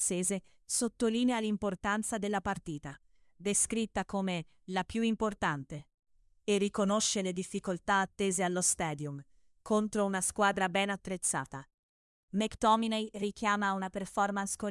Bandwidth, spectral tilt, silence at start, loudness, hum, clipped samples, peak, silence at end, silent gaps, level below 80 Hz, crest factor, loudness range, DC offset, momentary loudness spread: 12 kHz; -3.5 dB/octave; 0 s; -32 LUFS; none; under 0.1%; -14 dBFS; 0 s; 5.94-5.98 s, 11.74-12.28 s; -60 dBFS; 18 dB; 2 LU; under 0.1%; 11 LU